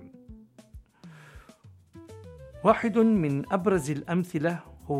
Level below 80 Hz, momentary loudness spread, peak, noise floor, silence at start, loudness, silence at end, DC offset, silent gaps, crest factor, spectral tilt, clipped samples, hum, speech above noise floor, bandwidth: -54 dBFS; 24 LU; -6 dBFS; -54 dBFS; 0 s; -26 LUFS; 0 s; under 0.1%; none; 22 dB; -7.5 dB/octave; under 0.1%; none; 29 dB; 14 kHz